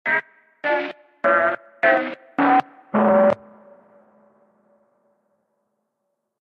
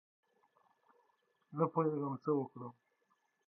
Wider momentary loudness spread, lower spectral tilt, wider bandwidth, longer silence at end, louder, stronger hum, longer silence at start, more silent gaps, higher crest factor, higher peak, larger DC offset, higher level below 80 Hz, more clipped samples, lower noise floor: second, 11 LU vs 16 LU; second, -7.5 dB/octave vs -11 dB/octave; about the same, 5.8 kHz vs 5.6 kHz; first, 3.1 s vs 0.75 s; first, -20 LUFS vs -37 LUFS; neither; second, 0.05 s vs 1.5 s; neither; about the same, 18 dB vs 22 dB; first, -4 dBFS vs -20 dBFS; neither; first, -70 dBFS vs under -90 dBFS; neither; about the same, -77 dBFS vs -79 dBFS